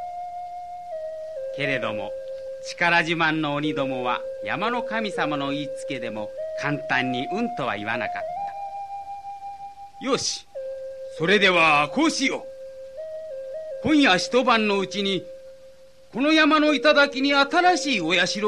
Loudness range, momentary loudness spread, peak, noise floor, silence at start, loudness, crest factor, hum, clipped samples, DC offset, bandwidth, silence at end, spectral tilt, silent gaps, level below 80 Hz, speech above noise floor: 8 LU; 18 LU; -6 dBFS; -50 dBFS; 0 s; -22 LUFS; 18 dB; none; under 0.1%; 0.3%; 11.5 kHz; 0 s; -3.5 dB/octave; none; -62 dBFS; 28 dB